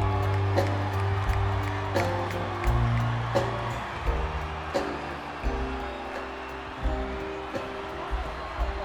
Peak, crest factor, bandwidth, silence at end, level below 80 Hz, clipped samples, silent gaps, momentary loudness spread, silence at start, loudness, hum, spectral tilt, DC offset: -10 dBFS; 18 dB; 17 kHz; 0 s; -34 dBFS; under 0.1%; none; 9 LU; 0 s; -30 LUFS; none; -6.5 dB/octave; under 0.1%